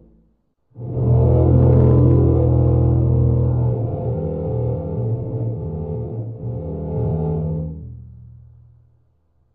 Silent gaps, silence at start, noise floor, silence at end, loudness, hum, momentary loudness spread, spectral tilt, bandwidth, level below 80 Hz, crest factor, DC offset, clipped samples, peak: none; 0.75 s; -62 dBFS; 1.3 s; -19 LUFS; none; 15 LU; -13.5 dB/octave; 2.1 kHz; -30 dBFS; 14 dB; under 0.1%; under 0.1%; -4 dBFS